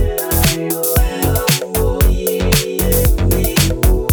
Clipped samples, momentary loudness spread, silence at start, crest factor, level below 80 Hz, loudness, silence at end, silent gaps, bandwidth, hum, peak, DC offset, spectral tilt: under 0.1%; 2 LU; 0 s; 14 dB; -18 dBFS; -15 LUFS; 0 s; none; over 20 kHz; none; 0 dBFS; under 0.1%; -4.5 dB/octave